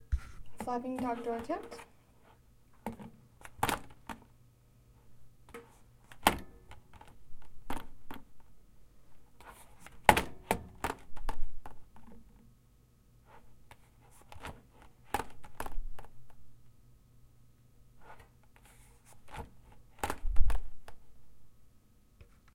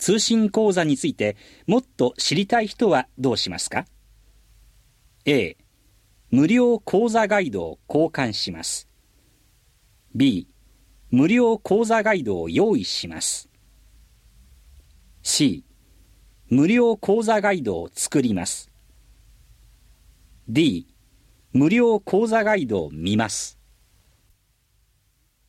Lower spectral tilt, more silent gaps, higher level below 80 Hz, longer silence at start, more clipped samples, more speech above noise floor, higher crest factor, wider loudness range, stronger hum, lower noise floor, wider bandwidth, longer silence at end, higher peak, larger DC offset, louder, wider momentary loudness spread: about the same, -4 dB/octave vs -4.5 dB/octave; neither; first, -44 dBFS vs -54 dBFS; about the same, 0.1 s vs 0 s; neither; second, 27 dB vs 44 dB; first, 34 dB vs 18 dB; first, 18 LU vs 5 LU; neither; about the same, -64 dBFS vs -65 dBFS; about the same, 16.5 kHz vs 15.5 kHz; second, 0.3 s vs 2 s; first, 0 dBFS vs -4 dBFS; neither; second, -37 LUFS vs -21 LUFS; first, 27 LU vs 10 LU